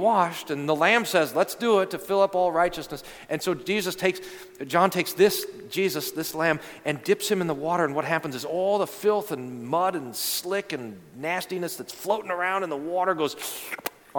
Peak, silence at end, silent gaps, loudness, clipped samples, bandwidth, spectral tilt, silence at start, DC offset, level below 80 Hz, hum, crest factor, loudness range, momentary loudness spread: -4 dBFS; 0 s; none; -26 LUFS; under 0.1%; 19 kHz; -4 dB/octave; 0 s; under 0.1%; -62 dBFS; none; 20 dB; 5 LU; 12 LU